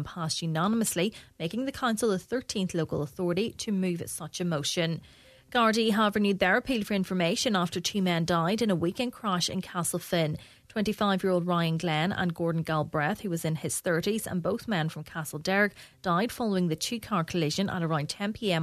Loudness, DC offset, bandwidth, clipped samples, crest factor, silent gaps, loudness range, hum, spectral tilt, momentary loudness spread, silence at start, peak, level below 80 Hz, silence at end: -29 LUFS; under 0.1%; 14 kHz; under 0.1%; 20 dB; none; 4 LU; none; -4.5 dB/octave; 7 LU; 0 s; -10 dBFS; -60 dBFS; 0 s